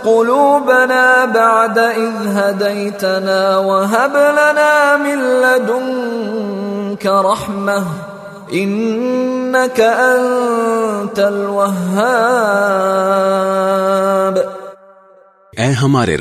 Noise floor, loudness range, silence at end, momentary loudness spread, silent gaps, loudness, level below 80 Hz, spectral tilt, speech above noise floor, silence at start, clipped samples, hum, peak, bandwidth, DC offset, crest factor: -46 dBFS; 4 LU; 0 s; 9 LU; none; -13 LUFS; -54 dBFS; -5 dB/octave; 33 dB; 0 s; under 0.1%; none; 0 dBFS; 13.5 kHz; under 0.1%; 14 dB